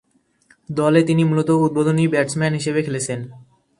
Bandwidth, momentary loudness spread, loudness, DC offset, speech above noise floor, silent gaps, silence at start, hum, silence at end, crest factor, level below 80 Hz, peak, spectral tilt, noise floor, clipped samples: 11.5 kHz; 11 LU; -19 LUFS; under 0.1%; 40 dB; none; 0.7 s; none; 0.4 s; 18 dB; -58 dBFS; -2 dBFS; -6.5 dB/octave; -58 dBFS; under 0.1%